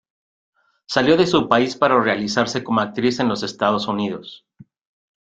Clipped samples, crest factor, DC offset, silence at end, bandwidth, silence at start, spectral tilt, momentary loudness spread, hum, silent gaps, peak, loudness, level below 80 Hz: under 0.1%; 20 dB; under 0.1%; 0.9 s; 9 kHz; 0.9 s; -5 dB/octave; 8 LU; none; none; 0 dBFS; -19 LUFS; -58 dBFS